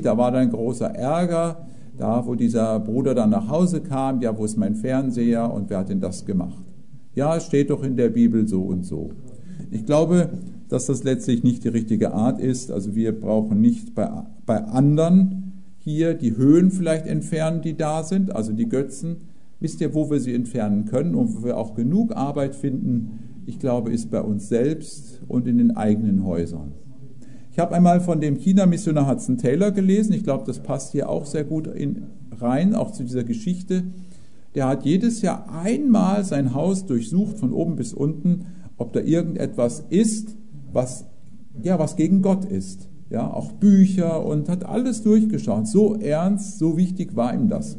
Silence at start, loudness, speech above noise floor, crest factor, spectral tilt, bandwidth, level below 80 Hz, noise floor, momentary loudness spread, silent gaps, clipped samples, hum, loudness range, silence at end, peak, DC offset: 0 s; -22 LUFS; 28 dB; 16 dB; -7.5 dB/octave; 11 kHz; -56 dBFS; -49 dBFS; 12 LU; none; under 0.1%; none; 5 LU; 0 s; -4 dBFS; 2%